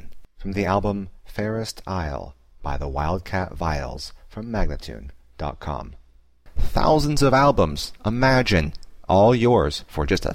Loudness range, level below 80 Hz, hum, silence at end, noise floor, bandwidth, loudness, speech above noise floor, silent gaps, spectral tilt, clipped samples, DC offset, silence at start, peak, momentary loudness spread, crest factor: 10 LU; -32 dBFS; none; 0 s; -49 dBFS; 16 kHz; -22 LUFS; 28 dB; none; -6 dB/octave; under 0.1%; 0.2%; 0.05 s; -6 dBFS; 19 LU; 16 dB